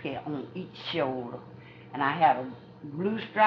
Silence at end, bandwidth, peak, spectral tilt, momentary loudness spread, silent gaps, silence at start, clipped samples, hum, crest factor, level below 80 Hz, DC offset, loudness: 0 s; 6.2 kHz; -10 dBFS; -3.5 dB/octave; 20 LU; none; 0 s; under 0.1%; none; 20 dB; -70 dBFS; under 0.1%; -30 LUFS